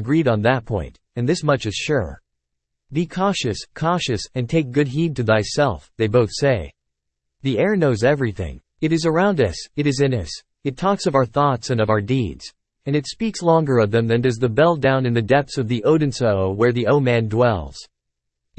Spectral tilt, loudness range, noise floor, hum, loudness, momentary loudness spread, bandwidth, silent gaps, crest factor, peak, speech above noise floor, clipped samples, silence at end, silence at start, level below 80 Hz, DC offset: -6 dB/octave; 4 LU; -79 dBFS; none; -20 LUFS; 10 LU; 8.8 kHz; none; 16 dB; -4 dBFS; 60 dB; under 0.1%; 0.75 s; 0 s; -46 dBFS; under 0.1%